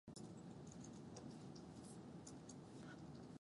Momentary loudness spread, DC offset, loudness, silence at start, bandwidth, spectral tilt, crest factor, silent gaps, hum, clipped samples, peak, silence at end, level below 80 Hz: 1 LU; under 0.1%; -57 LUFS; 0.05 s; 11.5 kHz; -5.5 dB/octave; 14 dB; none; none; under 0.1%; -42 dBFS; 0.05 s; -76 dBFS